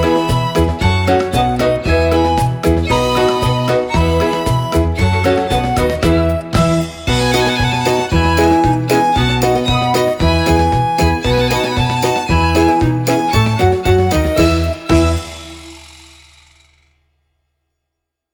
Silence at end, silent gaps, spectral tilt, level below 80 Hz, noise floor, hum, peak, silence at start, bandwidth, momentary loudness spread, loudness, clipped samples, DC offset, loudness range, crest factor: 2.45 s; none; -6 dB/octave; -24 dBFS; -77 dBFS; none; 0 dBFS; 0 s; over 20 kHz; 3 LU; -14 LUFS; under 0.1%; under 0.1%; 3 LU; 14 dB